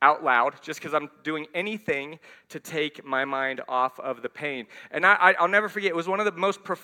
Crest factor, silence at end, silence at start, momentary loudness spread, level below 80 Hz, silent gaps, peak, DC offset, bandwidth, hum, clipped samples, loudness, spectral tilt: 24 dB; 0.05 s; 0 s; 14 LU; -76 dBFS; none; -2 dBFS; under 0.1%; 17.5 kHz; none; under 0.1%; -25 LUFS; -4 dB/octave